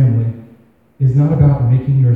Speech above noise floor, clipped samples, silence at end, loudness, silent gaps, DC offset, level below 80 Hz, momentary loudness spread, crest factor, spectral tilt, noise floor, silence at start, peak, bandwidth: 36 dB; under 0.1%; 0 s; -14 LUFS; none; under 0.1%; -34 dBFS; 9 LU; 12 dB; -12 dB/octave; -47 dBFS; 0 s; 0 dBFS; 2.6 kHz